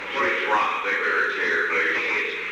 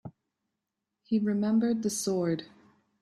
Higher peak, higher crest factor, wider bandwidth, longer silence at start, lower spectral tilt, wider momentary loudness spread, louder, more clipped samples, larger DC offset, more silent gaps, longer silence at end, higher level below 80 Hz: first, -10 dBFS vs -18 dBFS; about the same, 14 dB vs 14 dB; first, 19 kHz vs 13.5 kHz; about the same, 0 s vs 0.05 s; second, -2.5 dB/octave vs -5.5 dB/octave; second, 2 LU vs 7 LU; first, -22 LUFS vs -29 LUFS; neither; neither; neither; second, 0 s vs 0.55 s; first, -64 dBFS vs -72 dBFS